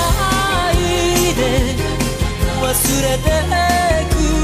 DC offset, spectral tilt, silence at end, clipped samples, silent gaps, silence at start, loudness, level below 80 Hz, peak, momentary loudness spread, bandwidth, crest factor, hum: under 0.1%; -4 dB/octave; 0 s; under 0.1%; none; 0 s; -16 LUFS; -22 dBFS; 0 dBFS; 4 LU; 15.5 kHz; 14 dB; none